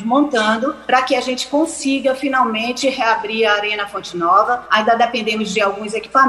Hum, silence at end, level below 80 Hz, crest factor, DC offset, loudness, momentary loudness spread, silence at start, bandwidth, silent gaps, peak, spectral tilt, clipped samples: none; 0 s; -56 dBFS; 16 dB; under 0.1%; -17 LUFS; 5 LU; 0 s; 12.5 kHz; none; 0 dBFS; -3 dB/octave; under 0.1%